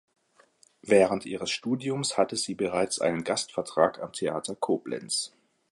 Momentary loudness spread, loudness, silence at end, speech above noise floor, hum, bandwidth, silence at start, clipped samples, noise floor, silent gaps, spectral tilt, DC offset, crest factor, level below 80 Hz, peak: 8 LU; -28 LUFS; 0.45 s; 35 dB; none; 11.5 kHz; 0.85 s; under 0.1%; -62 dBFS; none; -3.5 dB/octave; under 0.1%; 22 dB; -66 dBFS; -8 dBFS